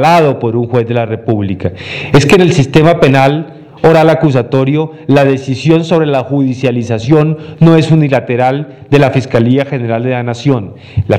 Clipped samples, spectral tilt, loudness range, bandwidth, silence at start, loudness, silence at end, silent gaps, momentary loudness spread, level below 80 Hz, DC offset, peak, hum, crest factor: 0.9%; -7 dB/octave; 2 LU; 12 kHz; 0 s; -10 LUFS; 0 s; none; 8 LU; -40 dBFS; under 0.1%; 0 dBFS; none; 10 dB